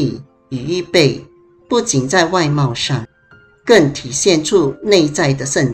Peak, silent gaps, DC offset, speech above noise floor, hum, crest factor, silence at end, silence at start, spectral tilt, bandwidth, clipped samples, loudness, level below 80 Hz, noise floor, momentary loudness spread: 0 dBFS; none; under 0.1%; 34 dB; none; 16 dB; 0 s; 0 s; -4.5 dB/octave; 13 kHz; under 0.1%; -15 LUFS; -48 dBFS; -48 dBFS; 12 LU